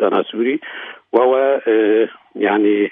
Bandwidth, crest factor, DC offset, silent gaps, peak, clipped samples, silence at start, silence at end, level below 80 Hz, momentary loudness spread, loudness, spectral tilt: 3.8 kHz; 16 dB; under 0.1%; none; -2 dBFS; under 0.1%; 0 s; 0 s; -72 dBFS; 9 LU; -16 LUFS; -8.5 dB/octave